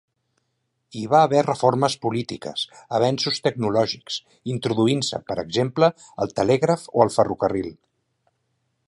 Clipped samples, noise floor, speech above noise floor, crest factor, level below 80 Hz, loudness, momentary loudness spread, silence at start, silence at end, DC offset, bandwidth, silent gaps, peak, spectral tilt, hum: under 0.1%; -74 dBFS; 53 dB; 22 dB; -58 dBFS; -22 LUFS; 11 LU; 0.95 s; 1.15 s; under 0.1%; 11.5 kHz; none; -2 dBFS; -5.5 dB/octave; none